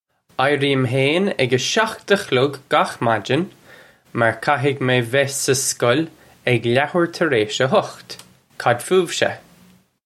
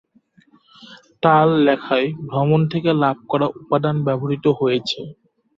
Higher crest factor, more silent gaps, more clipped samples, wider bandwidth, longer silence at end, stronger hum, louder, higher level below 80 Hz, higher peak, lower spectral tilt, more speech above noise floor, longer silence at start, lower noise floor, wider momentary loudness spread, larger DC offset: about the same, 18 dB vs 18 dB; neither; neither; first, 15.5 kHz vs 7.4 kHz; first, 0.65 s vs 0.45 s; neither; about the same, -19 LUFS vs -19 LUFS; about the same, -62 dBFS vs -60 dBFS; about the same, -2 dBFS vs -2 dBFS; second, -4 dB/octave vs -8 dB/octave; second, 34 dB vs 38 dB; second, 0.4 s vs 0.9 s; second, -52 dBFS vs -56 dBFS; about the same, 9 LU vs 7 LU; neither